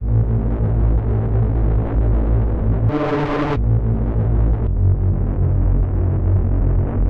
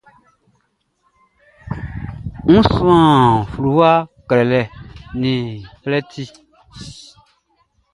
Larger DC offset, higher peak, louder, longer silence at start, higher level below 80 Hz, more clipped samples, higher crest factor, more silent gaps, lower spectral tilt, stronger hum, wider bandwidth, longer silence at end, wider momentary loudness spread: neither; second, -6 dBFS vs 0 dBFS; second, -19 LUFS vs -15 LUFS; second, 0 s vs 1.65 s; first, -20 dBFS vs -38 dBFS; neither; second, 10 dB vs 18 dB; neither; first, -10.5 dB/octave vs -7.5 dB/octave; neither; second, 4.3 kHz vs 11.5 kHz; second, 0 s vs 0.95 s; second, 2 LU vs 22 LU